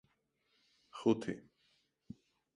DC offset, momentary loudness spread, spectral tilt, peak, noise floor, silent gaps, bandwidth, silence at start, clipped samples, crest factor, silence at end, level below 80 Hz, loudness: under 0.1%; 23 LU; -6.5 dB/octave; -18 dBFS; -79 dBFS; none; 11 kHz; 0.95 s; under 0.1%; 24 dB; 1.15 s; -76 dBFS; -36 LUFS